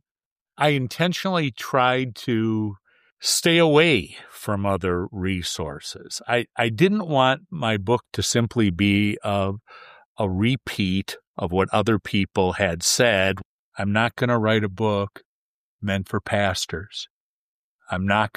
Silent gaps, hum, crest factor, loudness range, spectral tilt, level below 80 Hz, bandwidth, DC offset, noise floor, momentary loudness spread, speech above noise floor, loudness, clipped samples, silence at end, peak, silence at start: 3.12-3.17 s, 10.05-10.15 s, 11.27-11.34 s, 13.45-13.72 s, 15.25-15.79 s, 17.10-17.79 s; none; 18 dB; 4 LU; -4.5 dB/octave; -56 dBFS; 15.5 kHz; under 0.1%; under -90 dBFS; 13 LU; over 68 dB; -22 LUFS; under 0.1%; 0.1 s; -4 dBFS; 0.6 s